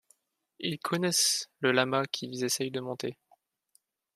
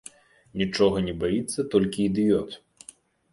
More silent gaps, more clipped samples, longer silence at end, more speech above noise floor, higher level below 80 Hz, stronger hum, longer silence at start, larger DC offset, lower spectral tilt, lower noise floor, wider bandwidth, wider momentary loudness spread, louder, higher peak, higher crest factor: neither; neither; first, 1.05 s vs 0.75 s; first, 41 dB vs 28 dB; second, -78 dBFS vs -50 dBFS; neither; about the same, 0.6 s vs 0.55 s; neither; second, -2.5 dB/octave vs -5.5 dB/octave; first, -71 dBFS vs -52 dBFS; first, 15 kHz vs 11.5 kHz; second, 12 LU vs 16 LU; second, -29 LUFS vs -25 LUFS; about the same, -8 dBFS vs -8 dBFS; first, 24 dB vs 18 dB